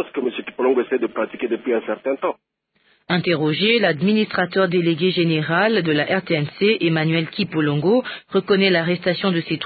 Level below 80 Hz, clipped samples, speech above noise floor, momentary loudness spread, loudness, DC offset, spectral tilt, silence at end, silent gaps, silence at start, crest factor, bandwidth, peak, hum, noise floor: -64 dBFS; under 0.1%; 43 dB; 7 LU; -19 LUFS; under 0.1%; -11 dB/octave; 0 s; none; 0 s; 16 dB; 4.8 kHz; -4 dBFS; none; -62 dBFS